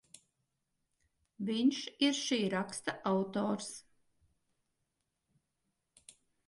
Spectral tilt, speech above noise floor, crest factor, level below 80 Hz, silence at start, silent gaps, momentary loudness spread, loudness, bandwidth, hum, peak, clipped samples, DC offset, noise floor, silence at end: -4 dB/octave; 50 dB; 20 dB; -80 dBFS; 1.4 s; none; 9 LU; -34 LUFS; 11.5 kHz; none; -18 dBFS; under 0.1%; under 0.1%; -84 dBFS; 2.65 s